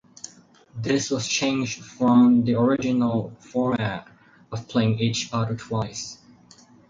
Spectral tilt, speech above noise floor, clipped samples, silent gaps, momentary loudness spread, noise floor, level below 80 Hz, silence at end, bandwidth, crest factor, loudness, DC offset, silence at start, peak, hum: -5.5 dB/octave; 30 dB; under 0.1%; none; 18 LU; -52 dBFS; -56 dBFS; 0.75 s; 7.6 kHz; 16 dB; -23 LUFS; under 0.1%; 0.25 s; -8 dBFS; none